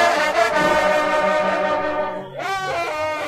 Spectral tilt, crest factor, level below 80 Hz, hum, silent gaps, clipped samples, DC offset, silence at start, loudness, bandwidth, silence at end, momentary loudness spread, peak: -3.5 dB/octave; 16 dB; -50 dBFS; none; none; under 0.1%; under 0.1%; 0 s; -19 LUFS; 15.5 kHz; 0 s; 8 LU; -4 dBFS